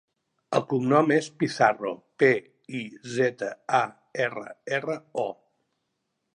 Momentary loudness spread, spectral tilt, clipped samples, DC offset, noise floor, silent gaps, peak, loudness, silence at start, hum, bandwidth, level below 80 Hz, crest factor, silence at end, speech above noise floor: 13 LU; -5.5 dB/octave; under 0.1%; under 0.1%; -79 dBFS; none; -6 dBFS; -26 LUFS; 0.5 s; none; 11 kHz; -76 dBFS; 20 dB; 1.05 s; 53 dB